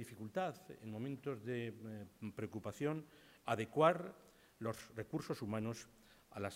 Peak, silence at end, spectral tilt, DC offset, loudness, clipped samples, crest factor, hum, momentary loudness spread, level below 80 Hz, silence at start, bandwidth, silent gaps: -16 dBFS; 0 s; -6.5 dB/octave; under 0.1%; -42 LUFS; under 0.1%; 26 dB; none; 18 LU; -76 dBFS; 0 s; 16 kHz; none